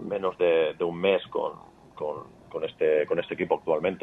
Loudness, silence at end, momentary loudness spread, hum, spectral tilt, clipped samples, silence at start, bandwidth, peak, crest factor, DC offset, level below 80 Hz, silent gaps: -27 LUFS; 0.05 s; 11 LU; none; -7 dB/octave; under 0.1%; 0 s; 4.1 kHz; -8 dBFS; 20 dB; under 0.1%; -66 dBFS; none